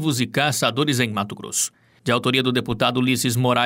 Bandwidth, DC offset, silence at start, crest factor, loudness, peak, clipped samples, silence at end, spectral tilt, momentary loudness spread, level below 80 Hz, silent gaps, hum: 16.5 kHz; under 0.1%; 0 s; 16 dB; -21 LUFS; -4 dBFS; under 0.1%; 0 s; -4 dB/octave; 5 LU; -56 dBFS; none; none